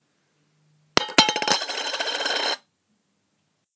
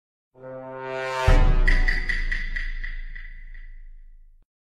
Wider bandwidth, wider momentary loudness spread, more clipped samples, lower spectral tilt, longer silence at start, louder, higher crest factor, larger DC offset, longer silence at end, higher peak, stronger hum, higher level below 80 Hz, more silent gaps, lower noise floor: about the same, 8 kHz vs 7.8 kHz; second, 8 LU vs 23 LU; neither; second, -1 dB/octave vs -5.5 dB/octave; first, 0.95 s vs 0.4 s; first, -22 LUFS vs -26 LUFS; first, 26 dB vs 18 dB; neither; first, 1.2 s vs 0.55 s; first, 0 dBFS vs -6 dBFS; neither; second, -62 dBFS vs -24 dBFS; neither; first, -72 dBFS vs -46 dBFS